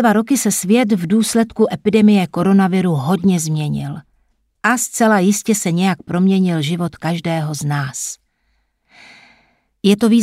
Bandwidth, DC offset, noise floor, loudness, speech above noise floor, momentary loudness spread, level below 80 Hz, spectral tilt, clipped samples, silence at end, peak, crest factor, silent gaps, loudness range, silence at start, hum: 16 kHz; under 0.1%; -64 dBFS; -16 LUFS; 49 dB; 8 LU; -54 dBFS; -5.5 dB/octave; under 0.1%; 0 s; -2 dBFS; 16 dB; none; 6 LU; 0 s; none